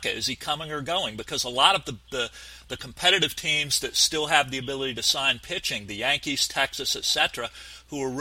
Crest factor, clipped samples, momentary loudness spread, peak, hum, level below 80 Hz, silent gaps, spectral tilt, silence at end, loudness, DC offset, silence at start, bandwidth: 24 dB; under 0.1%; 13 LU; -2 dBFS; none; -54 dBFS; none; -1.5 dB/octave; 0 s; -24 LUFS; under 0.1%; 0 s; 16 kHz